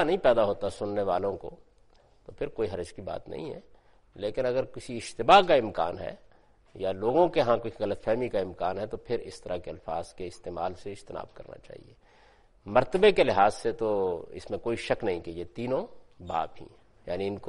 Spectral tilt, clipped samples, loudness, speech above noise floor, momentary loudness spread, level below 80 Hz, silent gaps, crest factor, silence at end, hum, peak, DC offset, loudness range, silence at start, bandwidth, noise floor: -5.5 dB/octave; under 0.1%; -28 LUFS; 32 dB; 18 LU; -52 dBFS; none; 24 dB; 0 s; none; -4 dBFS; under 0.1%; 10 LU; 0 s; 11.5 kHz; -60 dBFS